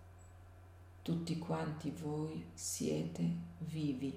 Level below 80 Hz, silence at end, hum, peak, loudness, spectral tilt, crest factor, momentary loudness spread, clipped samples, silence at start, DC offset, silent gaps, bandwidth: -66 dBFS; 0 s; none; -24 dBFS; -41 LUFS; -5.5 dB/octave; 16 dB; 21 LU; under 0.1%; 0 s; under 0.1%; none; 16 kHz